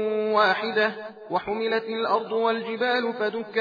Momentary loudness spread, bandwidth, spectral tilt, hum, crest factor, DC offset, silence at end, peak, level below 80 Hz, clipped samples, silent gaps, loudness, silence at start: 7 LU; 5 kHz; -5.5 dB/octave; none; 18 dB; under 0.1%; 0 s; -6 dBFS; -68 dBFS; under 0.1%; none; -25 LUFS; 0 s